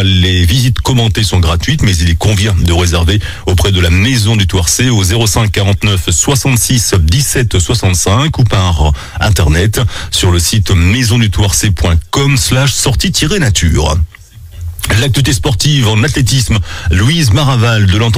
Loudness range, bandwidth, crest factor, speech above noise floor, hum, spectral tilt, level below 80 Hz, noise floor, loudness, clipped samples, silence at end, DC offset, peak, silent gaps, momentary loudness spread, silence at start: 2 LU; 16.5 kHz; 10 dB; 20 dB; none; -4 dB/octave; -20 dBFS; -30 dBFS; -10 LUFS; under 0.1%; 0 s; under 0.1%; 0 dBFS; none; 4 LU; 0 s